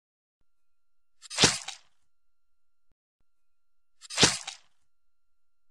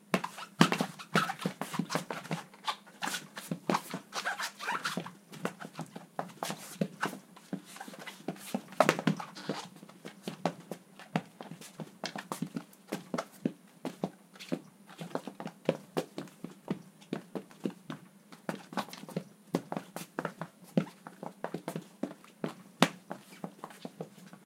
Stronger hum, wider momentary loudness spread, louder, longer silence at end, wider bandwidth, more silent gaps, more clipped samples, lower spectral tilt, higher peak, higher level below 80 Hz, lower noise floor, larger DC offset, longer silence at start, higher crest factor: neither; about the same, 18 LU vs 16 LU; first, -24 LUFS vs -37 LUFS; first, 1.15 s vs 0 s; second, 14.5 kHz vs 16.5 kHz; first, 2.92-3.19 s vs none; neither; second, -1.5 dB/octave vs -4.5 dB/octave; second, -6 dBFS vs 0 dBFS; first, -58 dBFS vs -80 dBFS; first, -78 dBFS vs -56 dBFS; neither; first, 1.25 s vs 0.05 s; second, 28 dB vs 36 dB